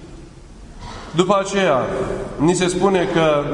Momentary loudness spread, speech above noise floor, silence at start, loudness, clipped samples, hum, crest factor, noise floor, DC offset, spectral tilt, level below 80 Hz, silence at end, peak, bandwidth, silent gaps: 13 LU; 22 dB; 0 s; -18 LUFS; under 0.1%; none; 18 dB; -39 dBFS; under 0.1%; -5 dB/octave; -40 dBFS; 0 s; 0 dBFS; 11 kHz; none